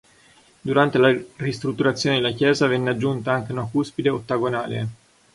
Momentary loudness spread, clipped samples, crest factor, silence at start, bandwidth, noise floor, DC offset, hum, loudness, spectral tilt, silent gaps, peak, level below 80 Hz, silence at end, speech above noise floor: 9 LU; under 0.1%; 20 dB; 0.65 s; 11.5 kHz; -54 dBFS; under 0.1%; none; -22 LUFS; -6 dB/octave; none; -4 dBFS; -58 dBFS; 0.4 s; 33 dB